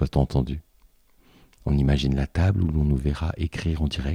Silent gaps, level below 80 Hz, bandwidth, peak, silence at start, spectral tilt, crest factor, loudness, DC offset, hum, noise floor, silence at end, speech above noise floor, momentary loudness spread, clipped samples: none; -30 dBFS; 10.5 kHz; -6 dBFS; 0 s; -7.5 dB/octave; 18 dB; -25 LUFS; under 0.1%; none; -58 dBFS; 0 s; 35 dB; 6 LU; under 0.1%